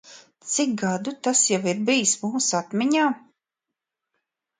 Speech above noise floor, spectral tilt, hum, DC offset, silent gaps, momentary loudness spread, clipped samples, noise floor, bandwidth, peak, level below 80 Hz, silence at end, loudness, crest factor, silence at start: 63 dB; -3 dB/octave; none; under 0.1%; none; 7 LU; under 0.1%; -86 dBFS; 9.6 kHz; -8 dBFS; -72 dBFS; 1.4 s; -22 LUFS; 18 dB; 0.05 s